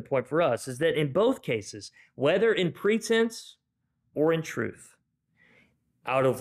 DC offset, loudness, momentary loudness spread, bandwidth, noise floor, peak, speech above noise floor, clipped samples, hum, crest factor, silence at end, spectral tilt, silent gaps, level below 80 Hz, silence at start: under 0.1%; -27 LUFS; 16 LU; 14.5 kHz; -77 dBFS; -14 dBFS; 50 dB; under 0.1%; none; 14 dB; 0 s; -5.5 dB/octave; none; -68 dBFS; 0 s